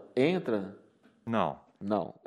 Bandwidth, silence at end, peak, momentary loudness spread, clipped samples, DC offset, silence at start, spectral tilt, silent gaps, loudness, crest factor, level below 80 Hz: 11 kHz; 0.15 s; -14 dBFS; 15 LU; under 0.1%; under 0.1%; 0 s; -7.5 dB/octave; none; -32 LUFS; 18 dB; -72 dBFS